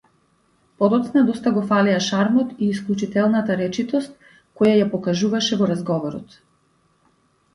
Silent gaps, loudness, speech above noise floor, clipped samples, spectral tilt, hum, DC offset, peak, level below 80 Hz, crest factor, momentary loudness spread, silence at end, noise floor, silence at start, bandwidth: none; -20 LUFS; 43 dB; under 0.1%; -6 dB/octave; none; under 0.1%; -4 dBFS; -62 dBFS; 16 dB; 7 LU; 1.3 s; -62 dBFS; 0.8 s; 11 kHz